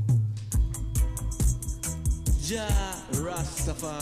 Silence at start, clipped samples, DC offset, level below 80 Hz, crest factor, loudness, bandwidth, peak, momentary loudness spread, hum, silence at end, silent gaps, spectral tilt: 0 s; under 0.1%; under 0.1%; -30 dBFS; 14 dB; -29 LUFS; 15.5 kHz; -14 dBFS; 4 LU; none; 0 s; none; -5 dB/octave